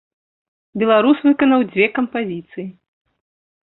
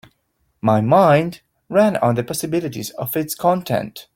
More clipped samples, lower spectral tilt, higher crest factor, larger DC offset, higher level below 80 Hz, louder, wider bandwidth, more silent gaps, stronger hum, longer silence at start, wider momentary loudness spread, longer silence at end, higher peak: neither; first, -10.5 dB/octave vs -6 dB/octave; about the same, 16 dB vs 16 dB; neither; second, -62 dBFS vs -56 dBFS; about the same, -16 LUFS vs -18 LUFS; second, 4.1 kHz vs 17 kHz; neither; neither; about the same, 0.75 s vs 0.65 s; first, 18 LU vs 10 LU; first, 0.9 s vs 0.15 s; about the same, -2 dBFS vs -2 dBFS